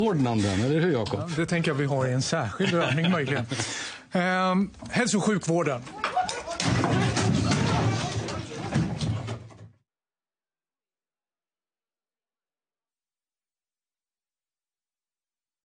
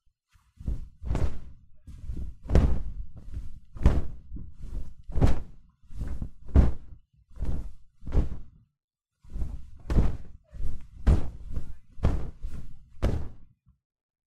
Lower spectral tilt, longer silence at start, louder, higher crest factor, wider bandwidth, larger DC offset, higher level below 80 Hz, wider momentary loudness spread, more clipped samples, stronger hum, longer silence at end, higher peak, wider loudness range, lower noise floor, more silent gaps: second, -5 dB/octave vs -8.5 dB/octave; second, 0 s vs 0.6 s; first, -26 LUFS vs -31 LUFS; about the same, 18 dB vs 20 dB; first, 10 kHz vs 7.6 kHz; neither; second, -52 dBFS vs -32 dBFS; second, 7 LU vs 20 LU; neither; neither; first, 6 s vs 0.8 s; second, -10 dBFS vs -6 dBFS; first, 9 LU vs 4 LU; first, under -90 dBFS vs -64 dBFS; second, none vs 8.84-8.88 s